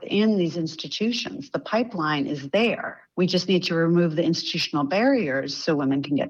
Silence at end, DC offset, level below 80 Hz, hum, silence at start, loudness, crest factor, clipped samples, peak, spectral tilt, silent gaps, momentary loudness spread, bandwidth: 0 s; under 0.1%; -68 dBFS; none; 0 s; -24 LUFS; 12 dB; under 0.1%; -10 dBFS; -5.5 dB/octave; none; 8 LU; 7.8 kHz